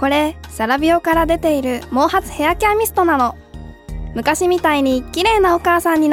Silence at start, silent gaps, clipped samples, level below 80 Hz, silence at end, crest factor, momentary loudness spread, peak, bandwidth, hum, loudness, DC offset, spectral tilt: 0 s; none; under 0.1%; -34 dBFS; 0 s; 14 dB; 9 LU; -2 dBFS; 17.5 kHz; none; -16 LUFS; under 0.1%; -4.5 dB/octave